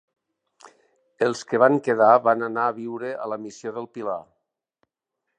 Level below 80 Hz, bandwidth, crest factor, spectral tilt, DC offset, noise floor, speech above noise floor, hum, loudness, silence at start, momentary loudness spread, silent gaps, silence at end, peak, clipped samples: -78 dBFS; 9.6 kHz; 22 dB; -6 dB/octave; under 0.1%; -81 dBFS; 59 dB; none; -22 LUFS; 0.65 s; 16 LU; none; 1.15 s; -4 dBFS; under 0.1%